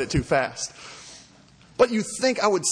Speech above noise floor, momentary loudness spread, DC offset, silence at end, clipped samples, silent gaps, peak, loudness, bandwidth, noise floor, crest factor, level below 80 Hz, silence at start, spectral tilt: 29 dB; 19 LU; under 0.1%; 0 s; under 0.1%; none; -6 dBFS; -23 LUFS; 10.5 kHz; -53 dBFS; 18 dB; -46 dBFS; 0 s; -4 dB/octave